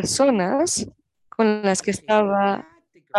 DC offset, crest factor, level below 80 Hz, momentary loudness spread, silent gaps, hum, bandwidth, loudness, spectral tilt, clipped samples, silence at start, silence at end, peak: under 0.1%; 16 dB; -56 dBFS; 10 LU; none; none; 12.5 kHz; -21 LUFS; -4 dB/octave; under 0.1%; 0 s; 0 s; -6 dBFS